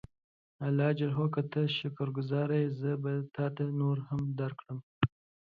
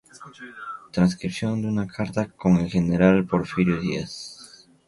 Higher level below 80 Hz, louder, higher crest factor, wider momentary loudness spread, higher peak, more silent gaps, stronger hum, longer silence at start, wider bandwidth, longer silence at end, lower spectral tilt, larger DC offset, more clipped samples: second, -64 dBFS vs -48 dBFS; second, -33 LUFS vs -23 LUFS; about the same, 22 dB vs 20 dB; second, 6 LU vs 19 LU; second, -10 dBFS vs -4 dBFS; first, 4.83-5.01 s vs none; neither; first, 0.6 s vs 0.2 s; second, 4.9 kHz vs 11.5 kHz; about the same, 0.4 s vs 0.4 s; first, -9.5 dB/octave vs -7 dB/octave; neither; neither